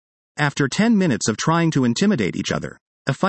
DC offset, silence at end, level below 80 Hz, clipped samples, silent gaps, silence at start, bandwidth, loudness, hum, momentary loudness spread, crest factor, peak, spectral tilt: under 0.1%; 0 s; -56 dBFS; under 0.1%; 2.81-3.05 s; 0.35 s; 8.8 kHz; -20 LUFS; none; 10 LU; 16 dB; -4 dBFS; -5 dB/octave